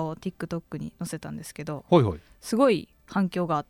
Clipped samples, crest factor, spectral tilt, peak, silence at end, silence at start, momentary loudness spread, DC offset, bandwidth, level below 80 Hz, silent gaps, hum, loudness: under 0.1%; 20 dB; -6.5 dB/octave; -6 dBFS; 0.05 s; 0 s; 15 LU; under 0.1%; 18 kHz; -54 dBFS; none; none; -27 LUFS